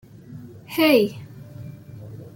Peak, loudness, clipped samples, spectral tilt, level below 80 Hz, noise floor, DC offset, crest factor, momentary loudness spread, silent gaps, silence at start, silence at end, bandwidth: -6 dBFS; -20 LUFS; under 0.1%; -5.5 dB/octave; -62 dBFS; -41 dBFS; under 0.1%; 20 dB; 24 LU; none; 0.3 s; 0.1 s; 16.5 kHz